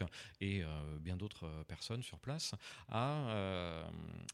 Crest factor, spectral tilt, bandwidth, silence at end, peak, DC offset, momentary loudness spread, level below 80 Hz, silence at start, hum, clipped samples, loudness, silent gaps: 20 dB; -5 dB/octave; 14.5 kHz; 0 s; -24 dBFS; under 0.1%; 9 LU; -58 dBFS; 0 s; none; under 0.1%; -43 LUFS; none